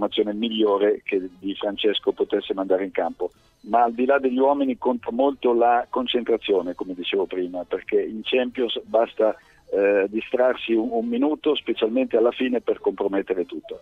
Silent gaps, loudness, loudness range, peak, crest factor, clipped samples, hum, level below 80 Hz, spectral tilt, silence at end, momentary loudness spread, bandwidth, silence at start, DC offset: none; -23 LUFS; 3 LU; -6 dBFS; 16 dB; under 0.1%; none; -62 dBFS; -6.5 dB/octave; 0.05 s; 8 LU; 4.9 kHz; 0 s; under 0.1%